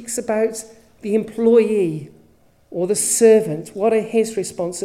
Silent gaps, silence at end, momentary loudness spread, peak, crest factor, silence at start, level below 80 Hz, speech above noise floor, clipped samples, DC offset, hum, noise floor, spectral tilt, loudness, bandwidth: none; 0 s; 13 LU; -2 dBFS; 16 dB; 0 s; -62 dBFS; 36 dB; under 0.1%; under 0.1%; none; -54 dBFS; -4.5 dB/octave; -18 LUFS; 15.5 kHz